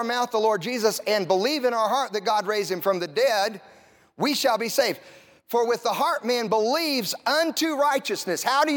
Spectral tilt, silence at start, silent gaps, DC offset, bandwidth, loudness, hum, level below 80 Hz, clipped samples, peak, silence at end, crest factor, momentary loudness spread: -3 dB/octave; 0 s; none; under 0.1%; 18 kHz; -24 LUFS; none; -80 dBFS; under 0.1%; -8 dBFS; 0 s; 16 dB; 4 LU